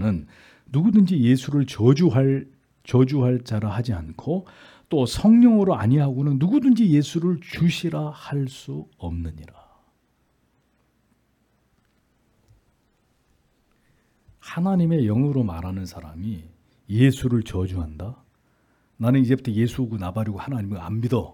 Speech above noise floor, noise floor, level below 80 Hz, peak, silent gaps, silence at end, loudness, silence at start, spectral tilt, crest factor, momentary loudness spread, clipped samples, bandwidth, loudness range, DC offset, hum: 46 dB; -66 dBFS; -50 dBFS; -4 dBFS; none; 0.05 s; -22 LUFS; 0 s; -8 dB/octave; 18 dB; 15 LU; under 0.1%; 14.5 kHz; 13 LU; under 0.1%; none